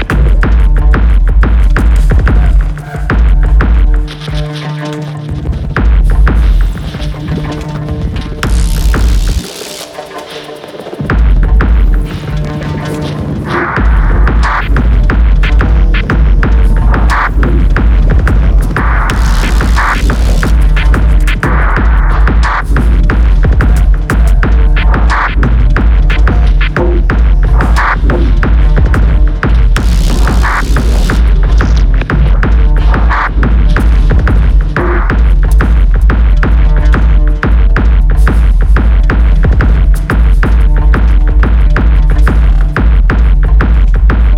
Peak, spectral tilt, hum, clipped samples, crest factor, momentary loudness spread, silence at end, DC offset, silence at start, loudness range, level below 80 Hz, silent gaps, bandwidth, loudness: 0 dBFS; -6.5 dB/octave; none; under 0.1%; 6 dB; 7 LU; 0 s; under 0.1%; 0 s; 4 LU; -8 dBFS; none; 10 kHz; -10 LUFS